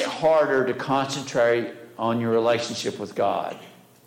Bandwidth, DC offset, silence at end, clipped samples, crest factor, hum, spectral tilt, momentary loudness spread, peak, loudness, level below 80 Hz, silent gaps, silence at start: 16.5 kHz; under 0.1%; 0.35 s; under 0.1%; 12 dB; none; -4.5 dB/octave; 9 LU; -12 dBFS; -23 LUFS; -68 dBFS; none; 0 s